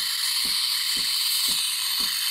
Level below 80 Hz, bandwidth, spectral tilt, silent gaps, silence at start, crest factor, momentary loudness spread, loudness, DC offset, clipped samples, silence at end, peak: -60 dBFS; 16 kHz; 2.5 dB/octave; none; 0 s; 14 dB; 2 LU; -22 LUFS; under 0.1%; under 0.1%; 0 s; -10 dBFS